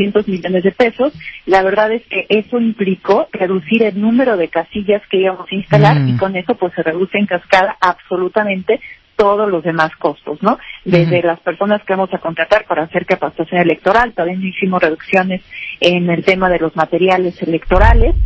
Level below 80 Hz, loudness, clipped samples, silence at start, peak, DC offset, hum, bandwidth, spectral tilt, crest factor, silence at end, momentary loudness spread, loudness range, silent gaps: -26 dBFS; -14 LUFS; 0.3%; 0 s; 0 dBFS; under 0.1%; none; 8 kHz; -7.5 dB/octave; 14 dB; 0 s; 7 LU; 2 LU; none